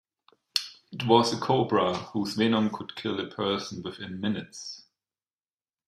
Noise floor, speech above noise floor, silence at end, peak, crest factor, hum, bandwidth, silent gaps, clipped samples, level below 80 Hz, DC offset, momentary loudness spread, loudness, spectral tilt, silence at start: under -90 dBFS; over 63 dB; 1.1 s; -6 dBFS; 24 dB; none; 14.5 kHz; none; under 0.1%; -68 dBFS; under 0.1%; 16 LU; -27 LUFS; -5 dB/octave; 0.55 s